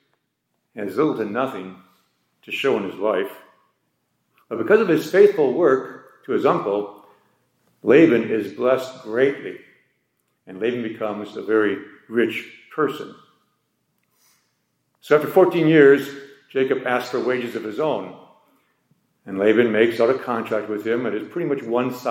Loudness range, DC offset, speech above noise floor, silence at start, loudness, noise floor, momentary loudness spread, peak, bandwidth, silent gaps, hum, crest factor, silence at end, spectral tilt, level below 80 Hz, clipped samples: 7 LU; under 0.1%; 54 dB; 0.75 s; -20 LUFS; -74 dBFS; 18 LU; -2 dBFS; 16.5 kHz; none; none; 20 dB; 0 s; -6.5 dB/octave; -76 dBFS; under 0.1%